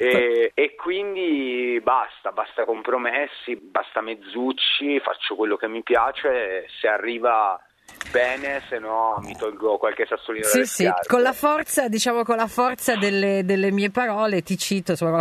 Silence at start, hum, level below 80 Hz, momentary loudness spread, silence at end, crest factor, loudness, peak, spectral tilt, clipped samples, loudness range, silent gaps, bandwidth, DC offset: 0 s; none; -60 dBFS; 8 LU; 0 s; 18 dB; -22 LUFS; -4 dBFS; -3.5 dB/octave; under 0.1%; 3 LU; none; 13.5 kHz; under 0.1%